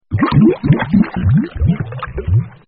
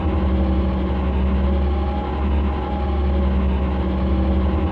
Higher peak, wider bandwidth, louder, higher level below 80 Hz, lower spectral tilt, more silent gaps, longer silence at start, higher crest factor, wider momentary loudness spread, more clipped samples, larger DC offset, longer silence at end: first, 0 dBFS vs -8 dBFS; about the same, 4.8 kHz vs 4.5 kHz; first, -15 LUFS vs -21 LUFS; second, -28 dBFS vs -20 dBFS; second, -8 dB/octave vs -10 dB/octave; neither; about the same, 0.1 s vs 0 s; about the same, 14 dB vs 10 dB; first, 9 LU vs 3 LU; neither; neither; first, 0.2 s vs 0 s